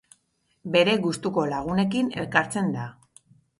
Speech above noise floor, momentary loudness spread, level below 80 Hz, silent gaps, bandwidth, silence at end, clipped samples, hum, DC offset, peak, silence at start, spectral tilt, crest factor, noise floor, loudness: 46 dB; 10 LU; -58 dBFS; none; 11.5 kHz; 0.7 s; under 0.1%; none; under 0.1%; -2 dBFS; 0.65 s; -5.5 dB/octave; 24 dB; -70 dBFS; -24 LUFS